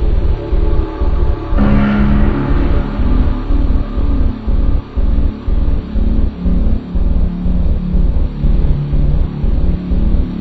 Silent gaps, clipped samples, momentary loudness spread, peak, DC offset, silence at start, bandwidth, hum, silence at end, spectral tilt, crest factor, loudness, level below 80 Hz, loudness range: none; under 0.1%; 5 LU; 0 dBFS; 0.7%; 0 s; 4.7 kHz; none; 0 s; -10 dB/octave; 12 dB; -17 LUFS; -14 dBFS; 2 LU